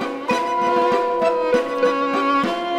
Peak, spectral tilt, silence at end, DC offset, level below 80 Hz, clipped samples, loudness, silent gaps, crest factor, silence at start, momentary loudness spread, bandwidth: -6 dBFS; -4.5 dB/octave; 0 s; under 0.1%; -60 dBFS; under 0.1%; -19 LUFS; none; 12 dB; 0 s; 2 LU; 12.5 kHz